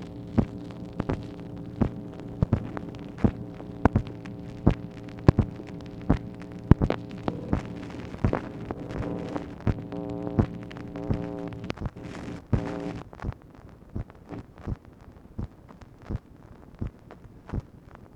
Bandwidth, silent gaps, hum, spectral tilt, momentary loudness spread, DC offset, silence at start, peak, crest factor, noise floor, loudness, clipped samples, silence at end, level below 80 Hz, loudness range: 8.6 kHz; none; none; -9 dB/octave; 17 LU; under 0.1%; 0 s; 0 dBFS; 30 dB; -49 dBFS; -31 LUFS; under 0.1%; 0 s; -38 dBFS; 14 LU